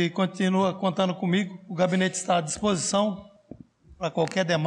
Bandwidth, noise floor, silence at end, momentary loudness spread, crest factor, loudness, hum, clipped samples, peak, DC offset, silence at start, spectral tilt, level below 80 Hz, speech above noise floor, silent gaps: 11 kHz; -48 dBFS; 0 s; 6 LU; 14 dB; -26 LUFS; none; under 0.1%; -12 dBFS; under 0.1%; 0 s; -5 dB/octave; -60 dBFS; 23 dB; none